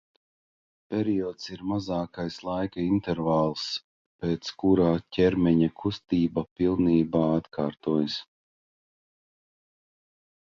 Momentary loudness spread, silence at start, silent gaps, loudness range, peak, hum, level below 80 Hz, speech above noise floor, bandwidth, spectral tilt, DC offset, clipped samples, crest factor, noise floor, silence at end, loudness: 10 LU; 0.9 s; 3.84-4.19 s, 6.51-6.56 s; 6 LU; -10 dBFS; none; -52 dBFS; over 64 dB; 7.4 kHz; -7.5 dB/octave; under 0.1%; under 0.1%; 18 dB; under -90 dBFS; 2.2 s; -27 LUFS